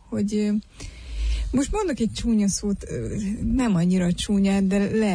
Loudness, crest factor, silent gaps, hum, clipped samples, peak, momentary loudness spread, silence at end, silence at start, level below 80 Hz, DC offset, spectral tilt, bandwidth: -24 LUFS; 10 dB; none; none; under 0.1%; -12 dBFS; 9 LU; 0 s; 0.1 s; -34 dBFS; under 0.1%; -6 dB/octave; 11 kHz